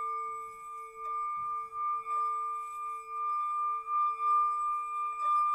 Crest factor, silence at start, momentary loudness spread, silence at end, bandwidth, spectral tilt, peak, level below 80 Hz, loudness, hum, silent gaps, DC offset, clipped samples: 12 dB; 0 s; 11 LU; 0 s; 12 kHz; -1.5 dB/octave; -22 dBFS; -72 dBFS; -32 LUFS; none; none; under 0.1%; under 0.1%